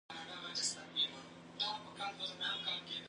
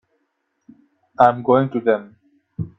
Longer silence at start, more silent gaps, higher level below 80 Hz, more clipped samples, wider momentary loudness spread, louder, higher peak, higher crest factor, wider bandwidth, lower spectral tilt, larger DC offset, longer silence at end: second, 0.1 s vs 1.2 s; neither; second, -80 dBFS vs -60 dBFS; neither; second, 9 LU vs 15 LU; second, -39 LUFS vs -18 LUFS; second, -24 dBFS vs 0 dBFS; about the same, 20 dB vs 20 dB; first, 10.5 kHz vs 6 kHz; second, -0.5 dB/octave vs -9 dB/octave; neither; about the same, 0 s vs 0.1 s